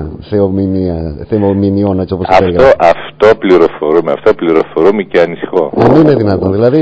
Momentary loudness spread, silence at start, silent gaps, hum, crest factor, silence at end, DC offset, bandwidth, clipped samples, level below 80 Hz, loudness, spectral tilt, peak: 7 LU; 0 s; none; none; 10 dB; 0 s; under 0.1%; 8 kHz; 4%; -32 dBFS; -10 LUFS; -8.5 dB/octave; 0 dBFS